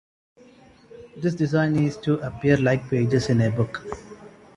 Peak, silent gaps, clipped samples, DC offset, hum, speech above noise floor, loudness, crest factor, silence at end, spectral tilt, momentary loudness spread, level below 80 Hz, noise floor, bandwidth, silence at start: -6 dBFS; none; under 0.1%; under 0.1%; none; 30 dB; -23 LUFS; 18 dB; 0.3 s; -7.5 dB/octave; 13 LU; -52 dBFS; -51 dBFS; 11 kHz; 0.95 s